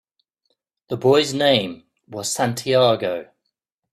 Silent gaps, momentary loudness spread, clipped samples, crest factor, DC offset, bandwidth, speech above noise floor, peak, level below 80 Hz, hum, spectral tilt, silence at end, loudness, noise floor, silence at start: none; 14 LU; under 0.1%; 20 dB; under 0.1%; 15 kHz; 58 dB; -2 dBFS; -62 dBFS; none; -4 dB/octave; 0.7 s; -19 LUFS; -77 dBFS; 0.9 s